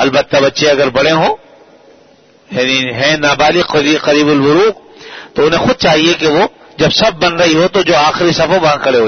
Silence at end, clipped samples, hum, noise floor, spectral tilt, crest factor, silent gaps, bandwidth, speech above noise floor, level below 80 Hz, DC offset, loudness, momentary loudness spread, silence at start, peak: 0 s; under 0.1%; none; -45 dBFS; -4 dB/octave; 12 dB; none; 6.6 kHz; 35 dB; -42 dBFS; under 0.1%; -10 LUFS; 6 LU; 0 s; 0 dBFS